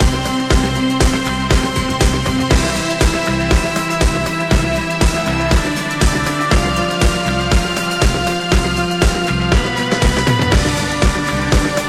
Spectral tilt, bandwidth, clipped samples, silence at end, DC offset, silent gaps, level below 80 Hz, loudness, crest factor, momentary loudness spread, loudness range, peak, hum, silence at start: -4.5 dB/octave; 15 kHz; under 0.1%; 0 s; under 0.1%; none; -20 dBFS; -16 LUFS; 14 dB; 2 LU; 1 LU; 0 dBFS; none; 0 s